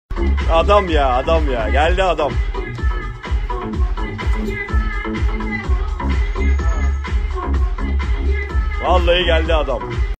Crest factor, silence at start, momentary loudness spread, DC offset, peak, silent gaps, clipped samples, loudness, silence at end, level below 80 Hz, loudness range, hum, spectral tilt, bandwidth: 16 dB; 0.1 s; 9 LU; under 0.1%; 0 dBFS; none; under 0.1%; -19 LUFS; 0.05 s; -20 dBFS; 5 LU; none; -6.5 dB/octave; 8.4 kHz